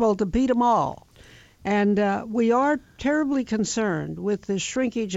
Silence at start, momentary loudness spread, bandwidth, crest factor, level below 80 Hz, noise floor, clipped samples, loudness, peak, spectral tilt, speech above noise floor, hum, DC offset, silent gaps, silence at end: 0 s; 7 LU; 8 kHz; 14 dB; -48 dBFS; -50 dBFS; under 0.1%; -23 LUFS; -10 dBFS; -5 dB/octave; 28 dB; none; under 0.1%; none; 0 s